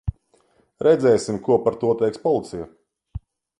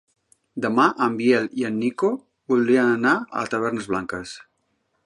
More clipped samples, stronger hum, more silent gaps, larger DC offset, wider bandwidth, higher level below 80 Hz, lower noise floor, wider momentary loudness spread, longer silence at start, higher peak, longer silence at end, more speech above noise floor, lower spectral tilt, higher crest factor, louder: neither; neither; neither; neither; about the same, 11.5 kHz vs 11.5 kHz; first, -42 dBFS vs -62 dBFS; second, -61 dBFS vs -71 dBFS; first, 22 LU vs 14 LU; second, 0.05 s vs 0.55 s; about the same, -4 dBFS vs -4 dBFS; second, 0.4 s vs 0.65 s; second, 42 dB vs 50 dB; about the same, -6.5 dB/octave vs -5.5 dB/octave; about the same, 18 dB vs 18 dB; about the same, -20 LUFS vs -22 LUFS